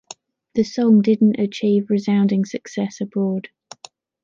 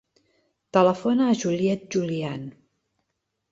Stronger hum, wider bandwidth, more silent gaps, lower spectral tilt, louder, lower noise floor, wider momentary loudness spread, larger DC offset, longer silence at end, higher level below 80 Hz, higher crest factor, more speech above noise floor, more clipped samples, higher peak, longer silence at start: neither; about the same, 7.4 kHz vs 7.8 kHz; neither; about the same, -7 dB/octave vs -6 dB/octave; first, -19 LUFS vs -23 LUFS; second, -47 dBFS vs -79 dBFS; about the same, 11 LU vs 12 LU; neither; second, 0.8 s vs 1 s; about the same, -64 dBFS vs -66 dBFS; second, 14 dB vs 20 dB; second, 29 dB vs 56 dB; neither; about the same, -6 dBFS vs -4 dBFS; second, 0.55 s vs 0.75 s